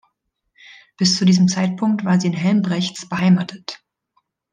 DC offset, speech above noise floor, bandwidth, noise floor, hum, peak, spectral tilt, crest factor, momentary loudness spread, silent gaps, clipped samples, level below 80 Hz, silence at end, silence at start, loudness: under 0.1%; 54 dB; 9.4 kHz; -72 dBFS; none; -2 dBFS; -5.5 dB/octave; 16 dB; 14 LU; none; under 0.1%; -62 dBFS; 0.8 s; 1 s; -18 LUFS